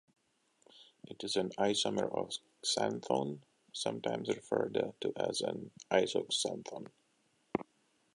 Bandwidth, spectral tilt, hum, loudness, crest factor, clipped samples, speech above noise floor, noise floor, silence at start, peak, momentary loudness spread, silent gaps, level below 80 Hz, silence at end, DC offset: 11.5 kHz; -3.5 dB/octave; none; -36 LUFS; 24 dB; under 0.1%; 40 dB; -75 dBFS; 0.75 s; -14 dBFS; 15 LU; none; -76 dBFS; 0.55 s; under 0.1%